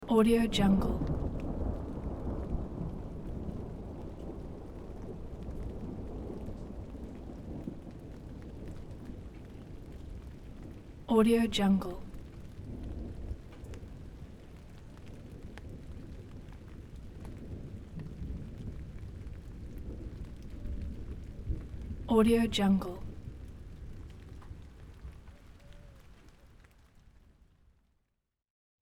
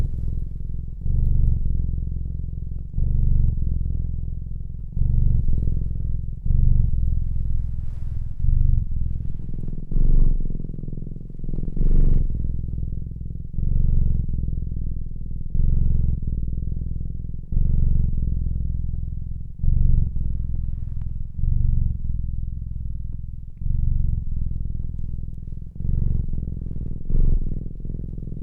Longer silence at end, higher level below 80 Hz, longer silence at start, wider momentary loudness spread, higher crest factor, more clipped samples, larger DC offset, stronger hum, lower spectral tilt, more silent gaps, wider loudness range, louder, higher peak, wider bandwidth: first, 1.7 s vs 0 s; second, -44 dBFS vs -22 dBFS; about the same, 0 s vs 0 s; first, 22 LU vs 11 LU; first, 22 dB vs 16 dB; neither; neither; neither; second, -6.5 dB/octave vs -13 dB/octave; neither; first, 17 LU vs 3 LU; second, -35 LUFS vs -27 LUFS; second, -14 dBFS vs -4 dBFS; first, 15.5 kHz vs 0.7 kHz